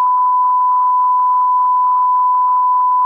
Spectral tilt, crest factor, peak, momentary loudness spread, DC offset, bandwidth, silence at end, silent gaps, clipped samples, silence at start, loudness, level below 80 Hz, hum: -1.5 dB/octave; 4 dB; -8 dBFS; 0 LU; under 0.1%; 1.9 kHz; 0 s; none; under 0.1%; 0 s; -13 LUFS; -82 dBFS; none